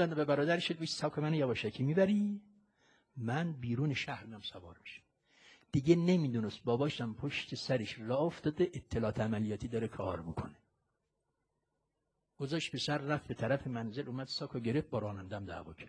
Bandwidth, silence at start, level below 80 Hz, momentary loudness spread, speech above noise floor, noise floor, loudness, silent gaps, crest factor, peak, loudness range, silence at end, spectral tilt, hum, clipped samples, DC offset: 10 kHz; 0 s; -64 dBFS; 13 LU; 49 dB; -84 dBFS; -35 LUFS; none; 22 dB; -14 dBFS; 7 LU; 0 s; -6.5 dB/octave; none; under 0.1%; under 0.1%